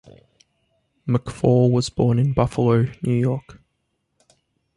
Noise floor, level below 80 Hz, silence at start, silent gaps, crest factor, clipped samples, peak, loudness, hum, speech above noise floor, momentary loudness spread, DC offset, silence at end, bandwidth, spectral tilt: -73 dBFS; -46 dBFS; 1.05 s; none; 18 dB; under 0.1%; -4 dBFS; -20 LUFS; none; 54 dB; 7 LU; under 0.1%; 1.25 s; 11.5 kHz; -8 dB/octave